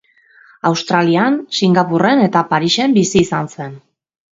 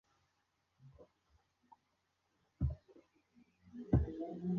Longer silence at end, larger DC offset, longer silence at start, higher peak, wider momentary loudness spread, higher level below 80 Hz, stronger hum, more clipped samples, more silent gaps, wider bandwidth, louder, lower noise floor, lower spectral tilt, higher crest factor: first, 0.55 s vs 0 s; neither; second, 0.65 s vs 0.85 s; first, 0 dBFS vs -18 dBFS; second, 8 LU vs 18 LU; about the same, -52 dBFS vs -50 dBFS; neither; neither; neither; first, 8 kHz vs 6.2 kHz; first, -14 LUFS vs -39 LUFS; second, -48 dBFS vs -82 dBFS; second, -5 dB/octave vs -11 dB/octave; second, 16 dB vs 26 dB